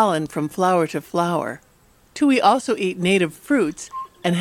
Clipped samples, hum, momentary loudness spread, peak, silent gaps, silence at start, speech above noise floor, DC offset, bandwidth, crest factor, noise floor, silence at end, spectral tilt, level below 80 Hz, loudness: under 0.1%; none; 15 LU; -4 dBFS; none; 0 s; 26 dB; under 0.1%; 16.5 kHz; 16 dB; -45 dBFS; 0 s; -5.5 dB/octave; -58 dBFS; -20 LUFS